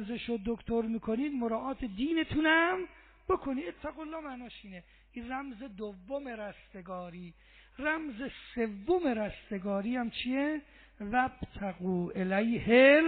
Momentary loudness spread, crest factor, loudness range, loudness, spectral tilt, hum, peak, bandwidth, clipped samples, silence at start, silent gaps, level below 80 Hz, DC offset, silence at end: 18 LU; 22 dB; 11 LU; -32 LUFS; -3.5 dB/octave; none; -10 dBFS; 4.6 kHz; under 0.1%; 0 s; none; -56 dBFS; under 0.1%; 0 s